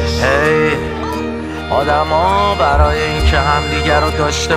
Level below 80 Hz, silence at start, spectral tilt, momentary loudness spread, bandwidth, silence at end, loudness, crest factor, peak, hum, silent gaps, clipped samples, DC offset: -22 dBFS; 0 s; -5 dB/octave; 8 LU; 14 kHz; 0 s; -14 LUFS; 14 dB; 0 dBFS; none; none; under 0.1%; under 0.1%